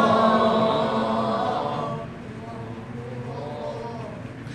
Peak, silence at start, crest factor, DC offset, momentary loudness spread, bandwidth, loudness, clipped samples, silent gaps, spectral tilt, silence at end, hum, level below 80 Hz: -8 dBFS; 0 s; 18 dB; under 0.1%; 17 LU; 10.5 kHz; -25 LUFS; under 0.1%; none; -6.5 dB/octave; 0 s; none; -54 dBFS